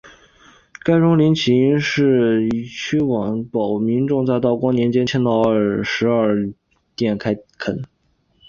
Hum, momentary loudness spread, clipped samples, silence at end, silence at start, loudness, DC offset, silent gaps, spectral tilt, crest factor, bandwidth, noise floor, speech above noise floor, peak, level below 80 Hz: none; 10 LU; under 0.1%; 0.65 s; 0.05 s; -18 LUFS; under 0.1%; none; -7 dB/octave; 14 dB; 7.2 kHz; -63 dBFS; 46 dB; -4 dBFS; -52 dBFS